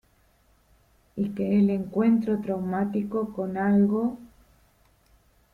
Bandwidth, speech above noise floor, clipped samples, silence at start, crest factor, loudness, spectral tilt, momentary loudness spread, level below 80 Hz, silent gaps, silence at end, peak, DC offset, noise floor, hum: 4.3 kHz; 39 dB; under 0.1%; 1.15 s; 16 dB; -25 LUFS; -10 dB/octave; 9 LU; -60 dBFS; none; 1.25 s; -12 dBFS; under 0.1%; -63 dBFS; none